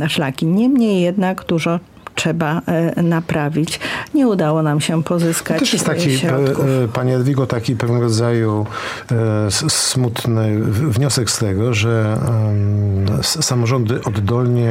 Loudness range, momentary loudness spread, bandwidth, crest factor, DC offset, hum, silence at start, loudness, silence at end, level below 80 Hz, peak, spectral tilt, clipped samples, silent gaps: 1 LU; 4 LU; 16 kHz; 14 dB; under 0.1%; none; 0 s; -17 LUFS; 0 s; -50 dBFS; -2 dBFS; -5.5 dB/octave; under 0.1%; none